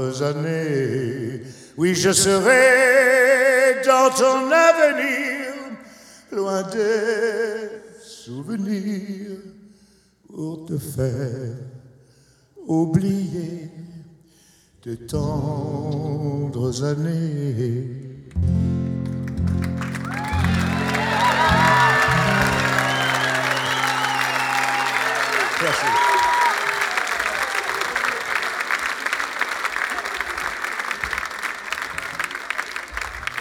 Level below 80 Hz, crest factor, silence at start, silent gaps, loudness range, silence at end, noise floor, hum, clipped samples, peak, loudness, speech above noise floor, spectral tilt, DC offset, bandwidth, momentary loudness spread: -44 dBFS; 20 dB; 0 s; none; 12 LU; 0 s; -56 dBFS; none; under 0.1%; 0 dBFS; -20 LUFS; 36 dB; -4.5 dB/octave; under 0.1%; 19 kHz; 17 LU